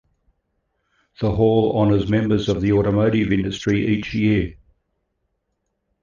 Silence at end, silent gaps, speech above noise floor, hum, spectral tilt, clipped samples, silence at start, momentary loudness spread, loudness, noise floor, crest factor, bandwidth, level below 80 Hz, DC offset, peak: 1.5 s; none; 56 dB; none; -7.5 dB/octave; under 0.1%; 1.2 s; 5 LU; -19 LUFS; -74 dBFS; 16 dB; 7.4 kHz; -40 dBFS; under 0.1%; -4 dBFS